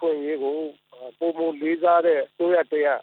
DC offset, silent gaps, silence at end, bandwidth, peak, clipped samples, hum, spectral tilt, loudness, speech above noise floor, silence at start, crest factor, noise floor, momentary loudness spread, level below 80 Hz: under 0.1%; none; 0 s; 4.2 kHz; -8 dBFS; under 0.1%; none; -8 dB/octave; -23 LUFS; 23 dB; 0 s; 16 dB; -43 dBFS; 14 LU; -84 dBFS